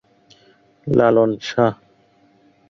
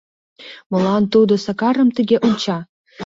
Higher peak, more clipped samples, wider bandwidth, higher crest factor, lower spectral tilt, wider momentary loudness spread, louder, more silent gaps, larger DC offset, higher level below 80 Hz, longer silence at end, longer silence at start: about the same, -2 dBFS vs -2 dBFS; neither; about the same, 7.4 kHz vs 7.8 kHz; about the same, 18 dB vs 14 dB; about the same, -7 dB/octave vs -6.5 dB/octave; second, 6 LU vs 11 LU; about the same, -17 LUFS vs -17 LUFS; second, none vs 0.66-0.70 s, 2.69-2.85 s; neither; about the same, -54 dBFS vs -58 dBFS; first, 0.95 s vs 0 s; first, 0.85 s vs 0.4 s